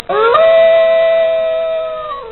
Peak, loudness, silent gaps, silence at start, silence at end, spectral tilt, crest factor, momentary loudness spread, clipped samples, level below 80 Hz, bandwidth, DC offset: 0 dBFS; -11 LUFS; none; 0.1 s; 0 s; 0 dB/octave; 12 dB; 12 LU; under 0.1%; -48 dBFS; 4.3 kHz; 0.4%